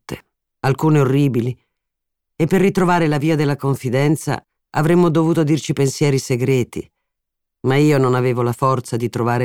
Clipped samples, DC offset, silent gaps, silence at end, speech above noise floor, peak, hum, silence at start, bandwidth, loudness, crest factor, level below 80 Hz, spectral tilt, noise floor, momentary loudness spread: under 0.1%; under 0.1%; none; 0 s; 62 dB; -4 dBFS; none; 0.1 s; 16.5 kHz; -17 LUFS; 14 dB; -50 dBFS; -7 dB/octave; -78 dBFS; 10 LU